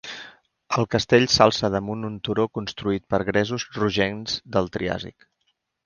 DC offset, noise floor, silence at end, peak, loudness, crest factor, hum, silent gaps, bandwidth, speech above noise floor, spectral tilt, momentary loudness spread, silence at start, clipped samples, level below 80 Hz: under 0.1%; -73 dBFS; 0.75 s; 0 dBFS; -23 LUFS; 24 dB; none; none; 10 kHz; 50 dB; -4.5 dB/octave; 12 LU; 0.05 s; under 0.1%; -50 dBFS